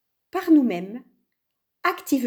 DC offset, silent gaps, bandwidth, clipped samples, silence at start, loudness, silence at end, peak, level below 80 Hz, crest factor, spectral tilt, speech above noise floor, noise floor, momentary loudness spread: under 0.1%; none; over 20 kHz; under 0.1%; 0.35 s; -23 LUFS; 0 s; -8 dBFS; -78 dBFS; 16 dB; -5 dB/octave; 58 dB; -80 dBFS; 17 LU